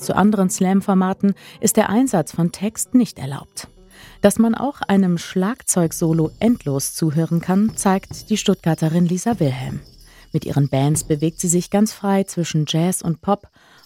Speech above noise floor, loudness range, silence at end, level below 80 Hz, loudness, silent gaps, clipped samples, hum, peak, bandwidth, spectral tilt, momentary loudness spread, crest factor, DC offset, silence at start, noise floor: 26 dB; 2 LU; 0.5 s; -50 dBFS; -19 LUFS; none; under 0.1%; none; -2 dBFS; 16.5 kHz; -5.5 dB/octave; 7 LU; 18 dB; under 0.1%; 0 s; -44 dBFS